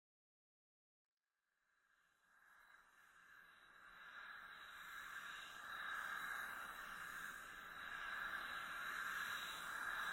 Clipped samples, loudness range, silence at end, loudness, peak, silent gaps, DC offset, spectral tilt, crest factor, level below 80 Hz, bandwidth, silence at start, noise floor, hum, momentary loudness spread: under 0.1%; 16 LU; 0 s; -49 LUFS; -34 dBFS; none; under 0.1%; -0.5 dB/octave; 18 dB; -78 dBFS; 16.5 kHz; 2.3 s; under -90 dBFS; none; 20 LU